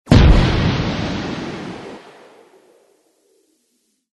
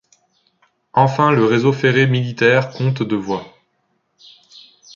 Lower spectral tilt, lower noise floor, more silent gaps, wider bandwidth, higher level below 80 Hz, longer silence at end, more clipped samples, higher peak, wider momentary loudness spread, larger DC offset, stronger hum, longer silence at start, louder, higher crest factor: about the same, -7 dB/octave vs -7 dB/octave; about the same, -66 dBFS vs -67 dBFS; neither; first, 10.5 kHz vs 7.2 kHz; first, -22 dBFS vs -58 dBFS; first, 2.2 s vs 1.5 s; neither; about the same, 0 dBFS vs -2 dBFS; first, 23 LU vs 7 LU; neither; neither; second, 0.05 s vs 0.95 s; about the same, -17 LUFS vs -16 LUFS; about the same, 18 dB vs 16 dB